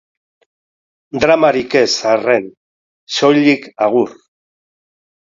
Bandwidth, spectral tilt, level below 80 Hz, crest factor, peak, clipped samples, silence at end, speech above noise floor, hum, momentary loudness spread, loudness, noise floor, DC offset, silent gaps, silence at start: 7.8 kHz; -4 dB/octave; -56 dBFS; 16 dB; 0 dBFS; under 0.1%; 1.25 s; over 77 dB; none; 11 LU; -14 LUFS; under -90 dBFS; under 0.1%; 2.57-3.07 s; 1.15 s